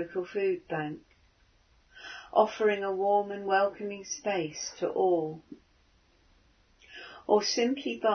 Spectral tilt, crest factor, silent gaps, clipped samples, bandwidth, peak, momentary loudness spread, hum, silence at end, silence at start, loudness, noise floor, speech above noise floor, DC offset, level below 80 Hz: -3.5 dB/octave; 22 dB; none; under 0.1%; 6.6 kHz; -10 dBFS; 19 LU; none; 0 s; 0 s; -29 LUFS; -65 dBFS; 36 dB; under 0.1%; -68 dBFS